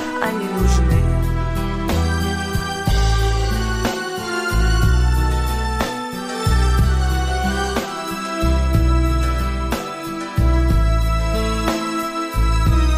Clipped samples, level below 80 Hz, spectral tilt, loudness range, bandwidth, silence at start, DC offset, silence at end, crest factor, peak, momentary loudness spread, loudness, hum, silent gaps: under 0.1%; -20 dBFS; -5.5 dB/octave; 1 LU; 16 kHz; 0 s; under 0.1%; 0 s; 16 dB; -2 dBFS; 6 LU; -20 LUFS; none; none